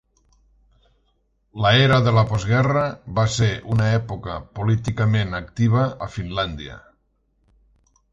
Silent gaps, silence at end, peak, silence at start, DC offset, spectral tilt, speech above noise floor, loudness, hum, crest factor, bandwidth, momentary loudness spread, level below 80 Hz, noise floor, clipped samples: none; 1.35 s; -4 dBFS; 1.55 s; under 0.1%; -6 dB/octave; 46 dB; -20 LUFS; none; 18 dB; 8 kHz; 14 LU; -44 dBFS; -66 dBFS; under 0.1%